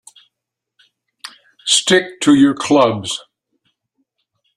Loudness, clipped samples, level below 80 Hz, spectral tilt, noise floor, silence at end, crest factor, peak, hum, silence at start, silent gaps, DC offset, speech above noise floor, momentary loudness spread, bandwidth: -14 LUFS; under 0.1%; -60 dBFS; -3 dB/octave; -81 dBFS; 1.35 s; 18 dB; 0 dBFS; none; 1.25 s; none; under 0.1%; 67 dB; 24 LU; 12.5 kHz